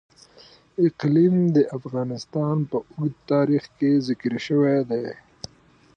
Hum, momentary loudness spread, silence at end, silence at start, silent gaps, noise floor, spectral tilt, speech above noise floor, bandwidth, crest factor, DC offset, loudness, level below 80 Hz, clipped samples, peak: none; 16 LU; 0.8 s; 0.8 s; none; -56 dBFS; -8 dB/octave; 34 dB; 8.6 kHz; 14 dB; under 0.1%; -23 LUFS; -64 dBFS; under 0.1%; -8 dBFS